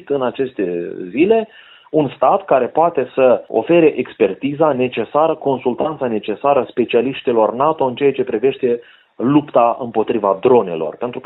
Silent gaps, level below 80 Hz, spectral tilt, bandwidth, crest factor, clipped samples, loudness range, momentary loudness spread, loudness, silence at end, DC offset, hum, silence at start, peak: none; -58 dBFS; -11 dB/octave; 4.1 kHz; 16 dB; under 0.1%; 2 LU; 8 LU; -16 LUFS; 0.05 s; under 0.1%; none; 0.05 s; 0 dBFS